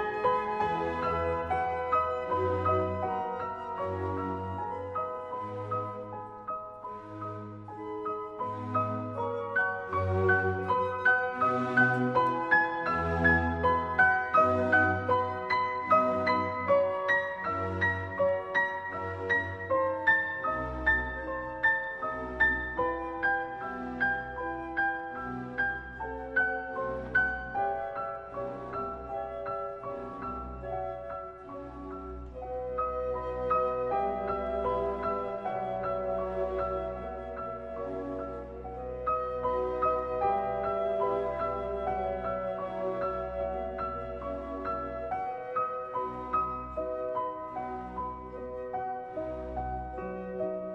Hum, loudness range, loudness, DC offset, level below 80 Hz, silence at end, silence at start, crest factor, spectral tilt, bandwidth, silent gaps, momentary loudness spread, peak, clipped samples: none; 11 LU; -31 LUFS; under 0.1%; -50 dBFS; 0 s; 0 s; 18 dB; -7.5 dB/octave; 8.6 kHz; none; 13 LU; -12 dBFS; under 0.1%